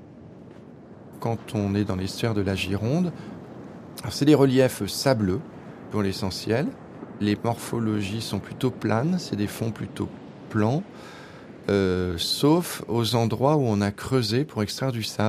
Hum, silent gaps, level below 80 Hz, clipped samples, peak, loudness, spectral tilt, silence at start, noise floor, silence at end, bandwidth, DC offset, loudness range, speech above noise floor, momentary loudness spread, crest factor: none; none; -56 dBFS; under 0.1%; -4 dBFS; -25 LUFS; -6 dB/octave; 0 s; -45 dBFS; 0 s; 15.5 kHz; under 0.1%; 4 LU; 21 dB; 20 LU; 20 dB